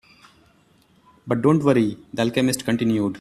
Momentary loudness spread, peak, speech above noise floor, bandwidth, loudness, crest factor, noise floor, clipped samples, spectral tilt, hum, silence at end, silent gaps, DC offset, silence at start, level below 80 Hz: 7 LU; -4 dBFS; 38 dB; 14 kHz; -21 LUFS; 18 dB; -58 dBFS; under 0.1%; -6 dB/octave; none; 0 s; none; under 0.1%; 1.25 s; -58 dBFS